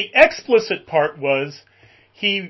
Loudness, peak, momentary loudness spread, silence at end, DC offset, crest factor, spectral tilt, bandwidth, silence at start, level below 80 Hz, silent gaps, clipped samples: -18 LUFS; 0 dBFS; 9 LU; 0 s; under 0.1%; 20 dB; -4 dB/octave; 8 kHz; 0 s; -56 dBFS; none; under 0.1%